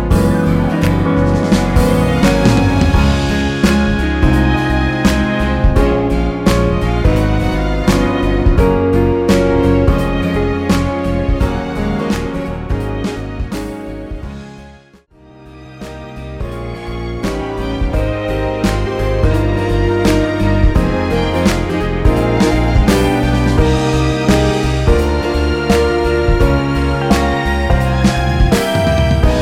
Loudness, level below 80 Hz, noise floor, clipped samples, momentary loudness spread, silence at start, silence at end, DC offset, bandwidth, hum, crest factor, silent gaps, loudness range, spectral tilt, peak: -14 LUFS; -18 dBFS; -44 dBFS; under 0.1%; 10 LU; 0 s; 0 s; under 0.1%; 16 kHz; none; 14 dB; none; 11 LU; -6.5 dB/octave; 0 dBFS